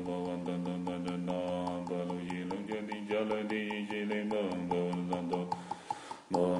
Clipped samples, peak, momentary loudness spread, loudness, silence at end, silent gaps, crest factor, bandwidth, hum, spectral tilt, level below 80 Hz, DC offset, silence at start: under 0.1%; -18 dBFS; 5 LU; -36 LUFS; 0 s; none; 18 dB; 11 kHz; none; -6.5 dB/octave; -70 dBFS; under 0.1%; 0 s